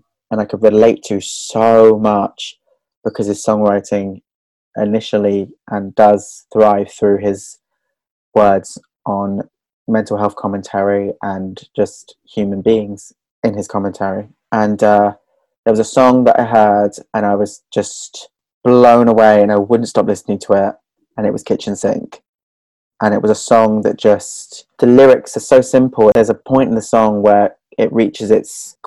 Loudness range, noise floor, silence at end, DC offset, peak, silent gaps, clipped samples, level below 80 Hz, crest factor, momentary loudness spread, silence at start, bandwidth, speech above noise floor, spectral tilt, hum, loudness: 7 LU; -74 dBFS; 0.15 s; under 0.1%; 0 dBFS; 2.97-3.02 s, 4.35-4.71 s, 8.11-8.32 s, 9.73-9.86 s, 13.31-13.43 s, 15.58-15.63 s, 18.54-18.61 s, 22.28-22.91 s; 0.4%; -52 dBFS; 14 dB; 15 LU; 0.3 s; 12 kHz; 62 dB; -6 dB/octave; none; -13 LUFS